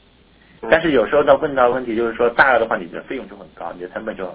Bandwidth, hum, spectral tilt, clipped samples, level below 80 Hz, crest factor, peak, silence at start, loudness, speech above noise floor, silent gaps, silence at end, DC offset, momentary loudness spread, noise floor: 4 kHz; none; -8.5 dB/octave; under 0.1%; -48 dBFS; 18 dB; 0 dBFS; 0.6 s; -17 LUFS; 33 dB; none; 0 s; under 0.1%; 17 LU; -51 dBFS